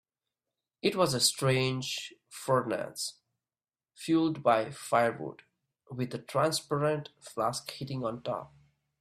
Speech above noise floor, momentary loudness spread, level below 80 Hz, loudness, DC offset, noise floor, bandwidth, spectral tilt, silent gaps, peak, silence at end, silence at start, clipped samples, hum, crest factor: over 60 dB; 13 LU; -70 dBFS; -30 LUFS; under 0.1%; under -90 dBFS; 15.5 kHz; -4 dB/octave; none; -12 dBFS; 0.55 s; 0.85 s; under 0.1%; none; 20 dB